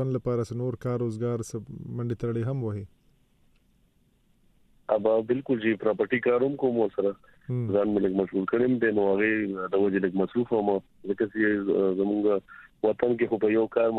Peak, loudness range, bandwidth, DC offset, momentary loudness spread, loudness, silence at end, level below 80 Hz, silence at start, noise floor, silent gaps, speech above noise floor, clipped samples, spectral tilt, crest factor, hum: -8 dBFS; 7 LU; 11 kHz; under 0.1%; 9 LU; -27 LUFS; 0 s; -62 dBFS; 0 s; -65 dBFS; none; 39 dB; under 0.1%; -8 dB/octave; 18 dB; none